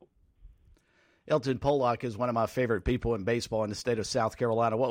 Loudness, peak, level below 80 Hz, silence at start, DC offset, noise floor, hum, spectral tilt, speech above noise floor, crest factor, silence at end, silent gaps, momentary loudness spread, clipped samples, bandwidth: -29 LUFS; -14 dBFS; -48 dBFS; 0.45 s; under 0.1%; -67 dBFS; none; -6 dB/octave; 38 dB; 16 dB; 0 s; none; 4 LU; under 0.1%; 16 kHz